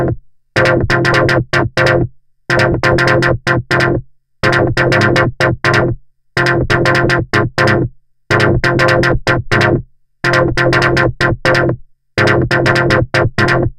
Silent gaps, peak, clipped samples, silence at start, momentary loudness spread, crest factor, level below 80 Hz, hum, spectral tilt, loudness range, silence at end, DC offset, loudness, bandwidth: none; 0 dBFS; under 0.1%; 0 s; 7 LU; 12 dB; -30 dBFS; none; -6 dB/octave; 1 LU; 0.05 s; under 0.1%; -13 LUFS; 12.5 kHz